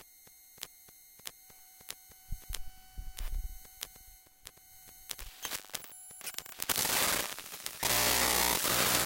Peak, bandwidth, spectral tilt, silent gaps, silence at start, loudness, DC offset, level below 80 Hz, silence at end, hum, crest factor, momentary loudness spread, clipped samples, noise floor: -4 dBFS; 17 kHz; -1 dB/octave; none; 0 s; -31 LUFS; under 0.1%; -48 dBFS; 0 s; none; 32 dB; 26 LU; under 0.1%; -58 dBFS